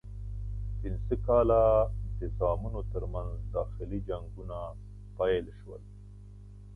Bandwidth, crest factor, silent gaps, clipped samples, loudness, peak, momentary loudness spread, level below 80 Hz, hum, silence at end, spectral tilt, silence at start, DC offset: 3.7 kHz; 20 dB; none; under 0.1%; -31 LUFS; -12 dBFS; 23 LU; -38 dBFS; 50 Hz at -35 dBFS; 0 s; -9.5 dB/octave; 0.05 s; under 0.1%